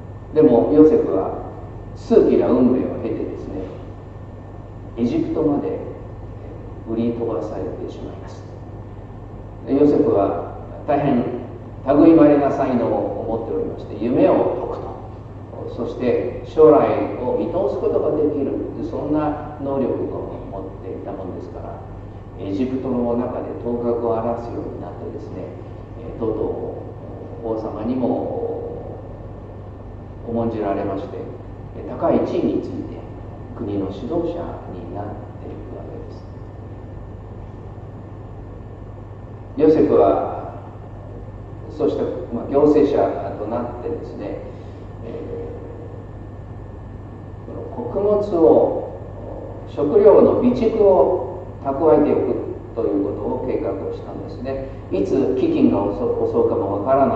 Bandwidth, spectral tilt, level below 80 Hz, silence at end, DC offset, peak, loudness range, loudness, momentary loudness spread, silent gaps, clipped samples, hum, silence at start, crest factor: 7.2 kHz; -9.5 dB/octave; -40 dBFS; 0 s; under 0.1%; 0 dBFS; 12 LU; -19 LUFS; 21 LU; none; under 0.1%; none; 0 s; 20 dB